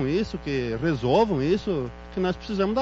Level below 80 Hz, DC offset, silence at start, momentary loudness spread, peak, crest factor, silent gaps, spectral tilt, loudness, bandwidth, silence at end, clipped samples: -44 dBFS; under 0.1%; 0 s; 7 LU; -10 dBFS; 14 dB; none; -7.5 dB/octave; -25 LUFS; 7.8 kHz; 0 s; under 0.1%